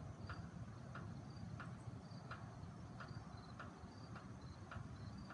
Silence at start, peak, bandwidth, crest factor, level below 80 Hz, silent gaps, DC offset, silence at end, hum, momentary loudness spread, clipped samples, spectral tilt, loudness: 0 s; -38 dBFS; 11 kHz; 16 dB; -66 dBFS; none; under 0.1%; 0 s; none; 3 LU; under 0.1%; -6.5 dB/octave; -54 LUFS